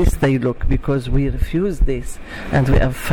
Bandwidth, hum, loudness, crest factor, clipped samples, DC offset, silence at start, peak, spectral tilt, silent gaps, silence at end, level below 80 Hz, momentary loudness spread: 17.5 kHz; none; -19 LUFS; 12 dB; under 0.1%; under 0.1%; 0 s; -4 dBFS; -7 dB/octave; none; 0 s; -20 dBFS; 7 LU